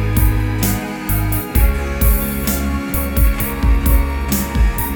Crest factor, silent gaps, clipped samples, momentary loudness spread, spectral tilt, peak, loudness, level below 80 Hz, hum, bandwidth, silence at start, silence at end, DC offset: 14 dB; none; under 0.1%; 3 LU; -5.5 dB/octave; 0 dBFS; -17 LUFS; -18 dBFS; none; over 20 kHz; 0 s; 0 s; under 0.1%